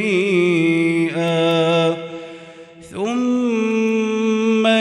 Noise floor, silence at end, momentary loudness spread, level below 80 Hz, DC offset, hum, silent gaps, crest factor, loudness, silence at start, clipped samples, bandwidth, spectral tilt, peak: -40 dBFS; 0 s; 15 LU; -66 dBFS; under 0.1%; none; none; 14 dB; -18 LUFS; 0 s; under 0.1%; 11.5 kHz; -6 dB/octave; -4 dBFS